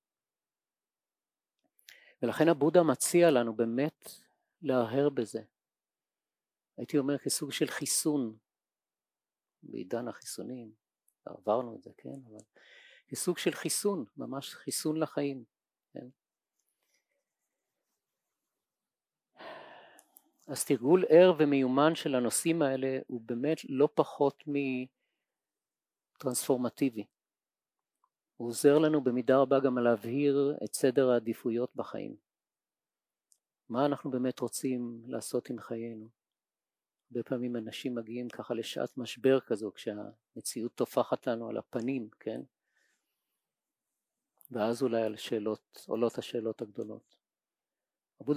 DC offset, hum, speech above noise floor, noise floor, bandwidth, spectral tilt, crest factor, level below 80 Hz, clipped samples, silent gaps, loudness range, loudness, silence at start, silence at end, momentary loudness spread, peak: under 0.1%; none; over 59 dB; under -90 dBFS; 16 kHz; -5 dB/octave; 24 dB; -84 dBFS; under 0.1%; none; 11 LU; -31 LUFS; 2.2 s; 0 s; 18 LU; -10 dBFS